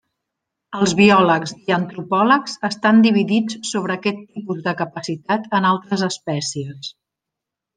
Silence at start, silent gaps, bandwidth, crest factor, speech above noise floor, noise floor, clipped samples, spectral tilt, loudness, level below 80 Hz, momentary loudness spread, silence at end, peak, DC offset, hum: 0.7 s; none; 9.8 kHz; 18 dB; 66 dB; -84 dBFS; under 0.1%; -5 dB/octave; -18 LUFS; -62 dBFS; 15 LU; 0.85 s; -2 dBFS; under 0.1%; none